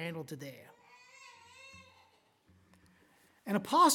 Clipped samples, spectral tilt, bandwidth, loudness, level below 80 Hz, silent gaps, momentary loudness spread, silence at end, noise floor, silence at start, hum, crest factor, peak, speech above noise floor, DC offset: under 0.1%; -3.5 dB/octave; 17 kHz; -34 LUFS; -82 dBFS; none; 25 LU; 0 s; -68 dBFS; 0 s; none; 22 dB; -14 dBFS; 38 dB; under 0.1%